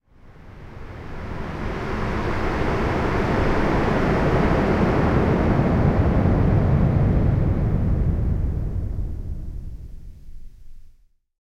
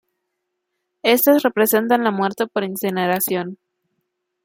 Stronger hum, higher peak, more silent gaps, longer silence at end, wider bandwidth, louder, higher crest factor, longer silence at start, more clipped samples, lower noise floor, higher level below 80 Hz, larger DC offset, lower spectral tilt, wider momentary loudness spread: neither; second, -6 dBFS vs -2 dBFS; neither; second, 0.55 s vs 0.9 s; second, 9 kHz vs 17 kHz; second, -21 LUFS vs -18 LUFS; about the same, 16 dB vs 18 dB; second, 0.25 s vs 1.05 s; neither; second, -53 dBFS vs -77 dBFS; first, -28 dBFS vs -68 dBFS; neither; first, -8.5 dB/octave vs -4 dB/octave; first, 17 LU vs 8 LU